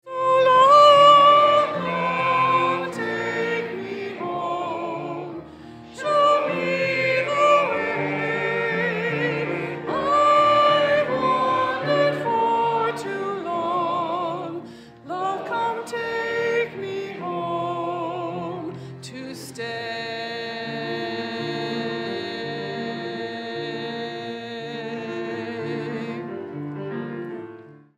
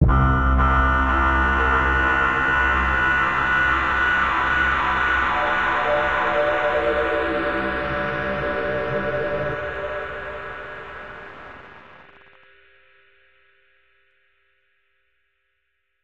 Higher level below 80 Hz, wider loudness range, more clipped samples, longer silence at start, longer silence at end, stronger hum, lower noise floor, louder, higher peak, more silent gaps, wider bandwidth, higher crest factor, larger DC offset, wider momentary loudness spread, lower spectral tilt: second, -68 dBFS vs -30 dBFS; second, 11 LU vs 16 LU; neither; about the same, 0.05 s vs 0 s; second, 0.25 s vs 4.05 s; neither; second, -43 dBFS vs -74 dBFS; about the same, -22 LUFS vs -20 LUFS; about the same, -4 dBFS vs -4 dBFS; neither; first, 13 kHz vs 7.8 kHz; about the same, 20 dB vs 18 dB; second, under 0.1% vs 0.3%; about the same, 16 LU vs 15 LU; second, -5 dB/octave vs -6.5 dB/octave